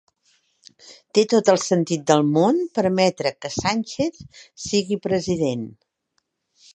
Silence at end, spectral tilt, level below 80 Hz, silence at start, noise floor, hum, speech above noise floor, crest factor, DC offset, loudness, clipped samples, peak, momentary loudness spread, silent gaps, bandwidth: 1.05 s; -5 dB/octave; -56 dBFS; 0.9 s; -73 dBFS; none; 52 dB; 22 dB; under 0.1%; -21 LUFS; under 0.1%; 0 dBFS; 9 LU; none; 9.8 kHz